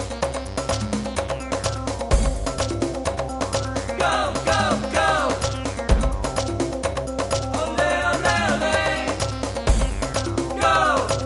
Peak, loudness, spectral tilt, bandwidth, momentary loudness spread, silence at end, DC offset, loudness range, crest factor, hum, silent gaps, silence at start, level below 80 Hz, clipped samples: -4 dBFS; -23 LUFS; -4.5 dB/octave; 11.5 kHz; 7 LU; 0 s; under 0.1%; 4 LU; 18 dB; none; none; 0 s; -30 dBFS; under 0.1%